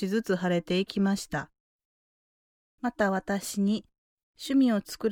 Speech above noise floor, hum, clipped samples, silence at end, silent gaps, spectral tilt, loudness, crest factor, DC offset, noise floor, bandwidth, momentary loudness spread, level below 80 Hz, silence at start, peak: over 63 dB; none; under 0.1%; 0 s; 1.60-1.79 s, 1.85-2.78 s, 3.98-4.17 s, 4.23-4.34 s; -5.5 dB/octave; -28 LUFS; 16 dB; under 0.1%; under -90 dBFS; 17.5 kHz; 10 LU; -62 dBFS; 0 s; -14 dBFS